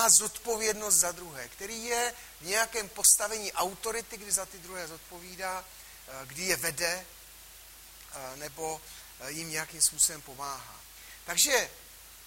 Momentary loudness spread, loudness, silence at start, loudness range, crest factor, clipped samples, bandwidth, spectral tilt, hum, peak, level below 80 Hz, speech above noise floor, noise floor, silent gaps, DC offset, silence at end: 23 LU; -28 LUFS; 0 s; 8 LU; 26 dB; under 0.1%; 16.5 kHz; 0 dB/octave; none; -6 dBFS; -60 dBFS; 20 dB; -51 dBFS; none; under 0.1%; 0 s